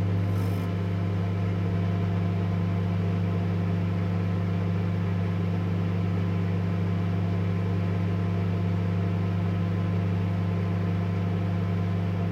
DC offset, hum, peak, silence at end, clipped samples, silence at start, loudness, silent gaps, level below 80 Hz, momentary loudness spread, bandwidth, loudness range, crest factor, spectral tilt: under 0.1%; 50 Hz at -30 dBFS; -16 dBFS; 0 s; under 0.1%; 0 s; -27 LUFS; none; -52 dBFS; 1 LU; 6.4 kHz; 0 LU; 10 dB; -9 dB/octave